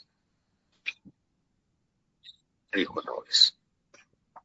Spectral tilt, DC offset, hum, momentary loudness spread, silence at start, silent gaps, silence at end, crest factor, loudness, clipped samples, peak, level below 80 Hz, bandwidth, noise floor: 1 dB/octave; under 0.1%; none; 17 LU; 0.85 s; none; 0.05 s; 26 dB; -26 LUFS; under 0.1%; -8 dBFS; -76 dBFS; 7.6 kHz; -76 dBFS